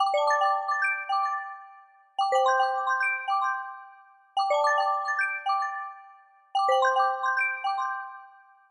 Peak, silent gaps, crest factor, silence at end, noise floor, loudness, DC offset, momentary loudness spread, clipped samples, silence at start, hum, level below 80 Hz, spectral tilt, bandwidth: -12 dBFS; none; 16 dB; 0.4 s; -54 dBFS; -26 LUFS; under 0.1%; 14 LU; under 0.1%; 0 s; none; -90 dBFS; 2.5 dB/octave; 11 kHz